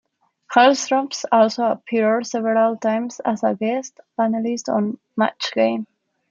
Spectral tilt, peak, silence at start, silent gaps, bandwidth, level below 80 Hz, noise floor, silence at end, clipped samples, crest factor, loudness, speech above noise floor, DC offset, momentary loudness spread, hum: -4 dB/octave; -2 dBFS; 0.5 s; none; 7.6 kHz; -74 dBFS; -44 dBFS; 0.45 s; under 0.1%; 18 dB; -20 LUFS; 24 dB; under 0.1%; 9 LU; none